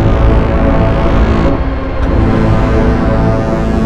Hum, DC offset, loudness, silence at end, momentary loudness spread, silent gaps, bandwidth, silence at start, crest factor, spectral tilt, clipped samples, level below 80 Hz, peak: none; under 0.1%; -12 LUFS; 0 s; 3 LU; none; 7.6 kHz; 0 s; 10 dB; -8.5 dB/octave; under 0.1%; -14 dBFS; 0 dBFS